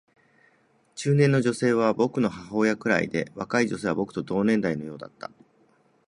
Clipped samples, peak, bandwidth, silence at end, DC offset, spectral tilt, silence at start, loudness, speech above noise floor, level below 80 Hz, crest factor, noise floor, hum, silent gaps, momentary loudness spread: under 0.1%; -6 dBFS; 11 kHz; 0.85 s; under 0.1%; -6.5 dB/octave; 0.95 s; -25 LUFS; 39 dB; -62 dBFS; 20 dB; -64 dBFS; none; none; 17 LU